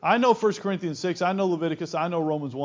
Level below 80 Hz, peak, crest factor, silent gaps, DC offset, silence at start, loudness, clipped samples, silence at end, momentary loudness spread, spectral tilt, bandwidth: -70 dBFS; -6 dBFS; 18 dB; none; under 0.1%; 0.05 s; -25 LUFS; under 0.1%; 0 s; 8 LU; -6 dB/octave; 7.6 kHz